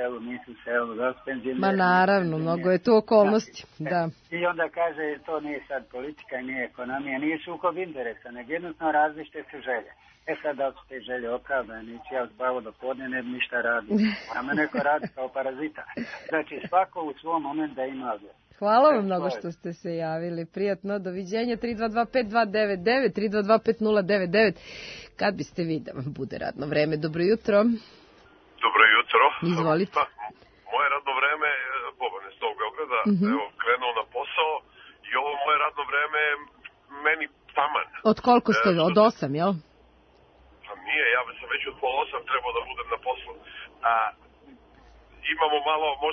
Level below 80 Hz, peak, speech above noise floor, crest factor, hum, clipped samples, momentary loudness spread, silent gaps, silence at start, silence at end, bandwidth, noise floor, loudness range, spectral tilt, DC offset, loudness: -62 dBFS; -4 dBFS; 32 dB; 22 dB; none; under 0.1%; 14 LU; none; 0 s; 0 s; 6.6 kHz; -58 dBFS; 7 LU; -6.5 dB/octave; under 0.1%; -26 LUFS